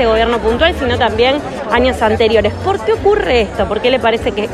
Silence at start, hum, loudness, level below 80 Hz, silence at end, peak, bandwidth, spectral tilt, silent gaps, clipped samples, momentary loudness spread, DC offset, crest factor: 0 s; none; -13 LUFS; -30 dBFS; 0 s; 0 dBFS; 12.5 kHz; -5.5 dB/octave; none; under 0.1%; 4 LU; under 0.1%; 12 dB